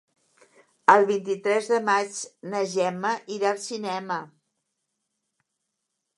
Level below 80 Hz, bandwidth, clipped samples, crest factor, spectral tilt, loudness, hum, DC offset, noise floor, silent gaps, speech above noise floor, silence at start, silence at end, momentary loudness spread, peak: -82 dBFS; 11.5 kHz; under 0.1%; 26 dB; -3.5 dB/octave; -24 LUFS; none; under 0.1%; -81 dBFS; none; 56 dB; 0.9 s; 1.9 s; 13 LU; -2 dBFS